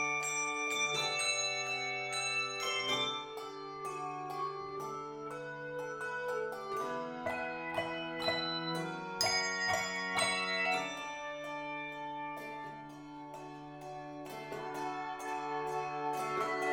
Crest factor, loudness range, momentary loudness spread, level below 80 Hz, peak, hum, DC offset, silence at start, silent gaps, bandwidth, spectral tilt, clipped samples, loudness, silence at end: 20 dB; 10 LU; 13 LU; -70 dBFS; -18 dBFS; none; under 0.1%; 0 s; none; 17 kHz; -2 dB/octave; under 0.1%; -36 LUFS; 0 s